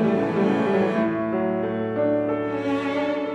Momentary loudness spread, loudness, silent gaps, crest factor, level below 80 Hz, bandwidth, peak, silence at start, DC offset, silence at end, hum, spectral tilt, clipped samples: 4 LU; -23 LUFS; none; 14 dB; -60 dBFS; 8.8 kHz; -8 dBFS; 0 s; under 0.1%; 0 s; none; -8 dB/octave; under 0.1%